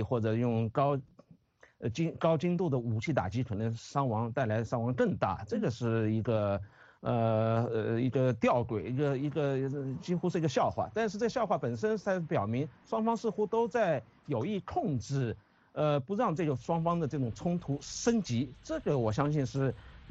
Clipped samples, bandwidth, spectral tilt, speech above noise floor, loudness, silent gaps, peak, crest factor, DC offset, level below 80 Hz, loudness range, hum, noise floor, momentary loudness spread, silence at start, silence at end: under 0.1%; 8 kHz; -7 dB/octave; 30 dB; -32 LUFS; none; -14 dBFS; 18 dB; under 0.1%; -60 dBFS; 2 LU; none; -61 dBFS; 6 LU; 0 s; 0 s